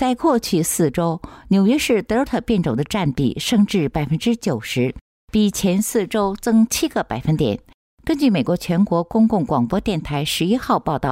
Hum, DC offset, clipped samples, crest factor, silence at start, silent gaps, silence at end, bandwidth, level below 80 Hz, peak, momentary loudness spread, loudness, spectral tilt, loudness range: none; under 0.1%; under 0.1%; 12 dB; 0 s; 5.01-5.28 s, 7.74-7.98 s; 0 s; 16 kHz; -42 dBFS; -6 dBFS; 5 LU; -19 LUFS; -5.5 dB/octave; 1 LU